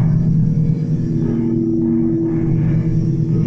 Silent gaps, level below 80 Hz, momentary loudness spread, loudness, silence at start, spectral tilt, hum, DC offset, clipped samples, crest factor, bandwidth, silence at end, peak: none; -30 dBFS; 3 LU; -17 LUFS; 0 s; -11.5 dB/octave; none; under 0.1%; under 0.1%; 10 dB; 6 kHz; 0 s; -6 dBFS